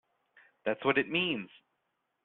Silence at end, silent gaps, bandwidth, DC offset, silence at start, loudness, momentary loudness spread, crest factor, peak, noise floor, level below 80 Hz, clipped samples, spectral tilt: 0.8 s; none; 4.2 kHz; under 0.1%; 0.65 s; -31 LUFS; 10 LU; 22 dB; -12 dBFS; -81 dBFS; -74 dBFS; under 0.1%; -2 dB/octave